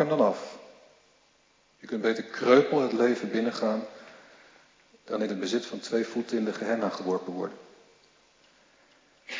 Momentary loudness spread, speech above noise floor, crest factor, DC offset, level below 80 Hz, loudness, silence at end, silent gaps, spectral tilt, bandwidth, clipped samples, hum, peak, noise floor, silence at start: 16 LU; 38 dB; 22 dB; under 0.1%; -82 dBFS; -28 LUFS; 0 s; none; -5.5 dB/octave; 7.6 kHz; under 0.1%; none; -8 dBFS; -65 dBFS; 0 s